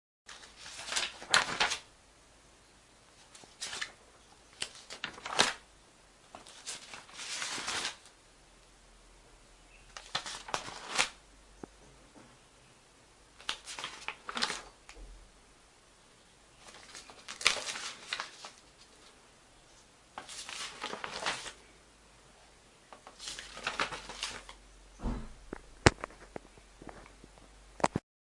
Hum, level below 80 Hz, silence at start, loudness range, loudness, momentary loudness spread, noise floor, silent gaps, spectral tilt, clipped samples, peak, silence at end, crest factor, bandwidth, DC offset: none; -56 dBFS; 0.25 s; 7 LU; -35 LUFS; 27 LU; -61 dBFS; none; -2 dB/octave; under 0.1%; 0 dBFS; 0.3 s; 40 dB; 11.5 kHz; under 0.1%